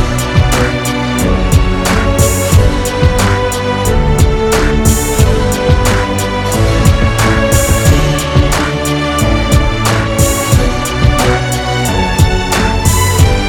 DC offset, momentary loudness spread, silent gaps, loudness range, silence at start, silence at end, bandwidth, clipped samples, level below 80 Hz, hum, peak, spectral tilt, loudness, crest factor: under 0.1%; 4 LU; none; 1 LU; 0 s; 0 s; 19.5 kHz; 0.8%; -16 dBFS; none; 0 dBFS; -5 dB/octave; -11 LUFS; 10 dB